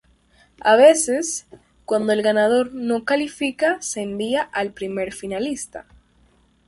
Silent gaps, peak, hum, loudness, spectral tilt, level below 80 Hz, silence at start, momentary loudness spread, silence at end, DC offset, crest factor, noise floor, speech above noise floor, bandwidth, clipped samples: none; -2 dBFS; none; -20 LUFS; -3 dB/octave; -58 dBFS; 0.65 s; 14 LU; 0.85 s; under 0.1%; 18 dB; -58 dBFS; 38 dB; 11.5 kHz; under 0.1%